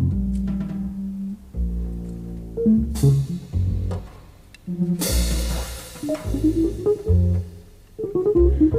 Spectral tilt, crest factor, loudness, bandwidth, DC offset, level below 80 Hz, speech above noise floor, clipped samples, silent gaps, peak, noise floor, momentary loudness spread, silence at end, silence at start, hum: -7 dB/octave; 16 dB; -23 LUFS; 16 kHz; under 0.1%; -28 dBFS; 26 dB; under 0.1%; none; -6 dBFS; -45 dBFS; 14 LU; 0 s; 0 s; none